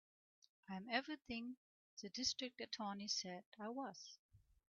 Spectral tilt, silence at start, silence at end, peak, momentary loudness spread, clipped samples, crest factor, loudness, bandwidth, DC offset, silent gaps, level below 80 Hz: -1.5 dB/octave; 0.7 s; 0.35 s; -24 dBFS; 16 LU; under 0.1%; 24 dB; -46 LUFS; 7.2 kHz; under 0.1%; 1.57-1.97 s, 3.46-3.52 s, 4.19-4.29 s; -80 dBFS